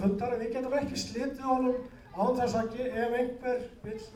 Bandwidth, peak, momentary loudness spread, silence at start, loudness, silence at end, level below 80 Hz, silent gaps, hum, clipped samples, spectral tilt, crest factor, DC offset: 16 kHz; -16 dBFS; 7 LU; 0 s; -31 LUFS; 0 s; -54 dBFS; none; none; under 0.1%; -5.5 dB/octave; 16 dB; under 0.1%